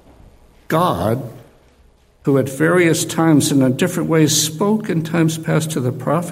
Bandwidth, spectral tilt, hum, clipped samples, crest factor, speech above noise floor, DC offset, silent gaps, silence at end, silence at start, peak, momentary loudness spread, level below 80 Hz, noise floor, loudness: 16 kHz; -5 dB/octave; none; under 0.1%; 16 dB; 36 dB; under 0.1%; none; 0 s; 0.7 s; -2 dBFS; 8 LU; -50 dBFS; -52 dBFS; -17 LUFS